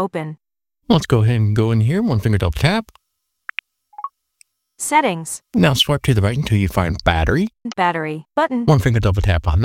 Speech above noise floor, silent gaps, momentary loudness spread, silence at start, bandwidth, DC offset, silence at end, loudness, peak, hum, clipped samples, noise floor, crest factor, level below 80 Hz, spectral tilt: 58 dB; none; 15 LU; 0 s; 16.5 kHz; under 0.1%; 0 s; -18 LUFS; 0 dBFS; none; under 0.1%; -74 dBFS; 18 dB; -32 dBFS; -6 dB/octave